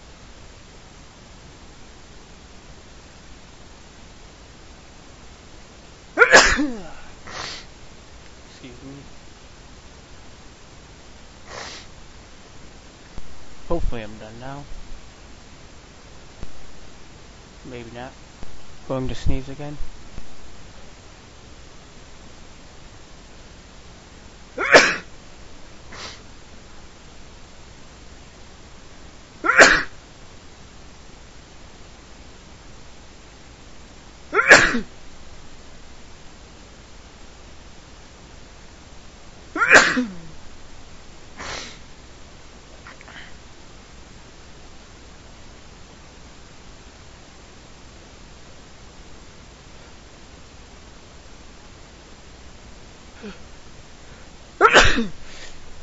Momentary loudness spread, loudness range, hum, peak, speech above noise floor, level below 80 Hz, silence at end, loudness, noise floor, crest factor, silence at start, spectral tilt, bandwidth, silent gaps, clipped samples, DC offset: 26 LU; 25 LU; none; 0 dBFS; 20 dB; -40 dBFS; 0 s; -17 LUFS; -44 dBFS; 26 dB; 0.35 s; -1 dB/octave; 8 kHz; none; under 0.1%; under 0.1%